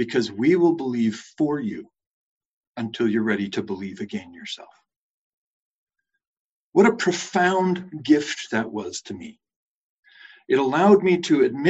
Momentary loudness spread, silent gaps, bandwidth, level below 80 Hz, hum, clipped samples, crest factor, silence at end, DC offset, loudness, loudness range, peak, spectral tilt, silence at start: 17 LU; 2.06-2.75 s, 4.96-5.87 s, 6.27-6.73 s, 9.56-10.03 s; 8.2 kHz; -66 dBFS; none; under 0.1%; 20 dB; 0 s; under 0.1%; -22 LUFS; 6 LU; -4 dBFS; -5.5 dB/octave; 0 s